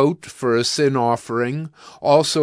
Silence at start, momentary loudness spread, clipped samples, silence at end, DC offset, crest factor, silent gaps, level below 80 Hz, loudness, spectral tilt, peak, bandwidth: 0 s; 9 LU; under 0.1%; 0 s; under 0.1%; 16 dB; none; -64 dBFS; -20 LUFS; -4.5 dB/octave; -2 dBFS; 11 kHz